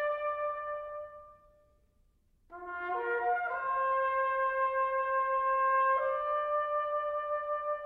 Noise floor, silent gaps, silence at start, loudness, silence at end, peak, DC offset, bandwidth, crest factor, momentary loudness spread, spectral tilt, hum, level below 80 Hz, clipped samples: -69 dBFS; none; 0 s; -31 LUFS; 0 s; -20 dBFS; under 0.1%; 4.4 kHz; 14 dB; 11 LU; -5 dB/octave; none; -68 dBFS; under 0.1%